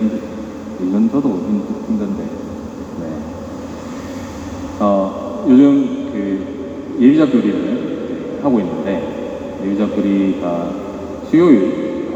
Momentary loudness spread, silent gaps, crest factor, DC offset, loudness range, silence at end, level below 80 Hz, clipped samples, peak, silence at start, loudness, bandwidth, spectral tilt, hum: 17 LU; none; 16 dB; under 0.1%; 8 LU; 0 s; -46 dBFS; under 0.1%; 0 dBFS; 0 s; -17 LUFS; 8 kHz; -8 dB/octave; none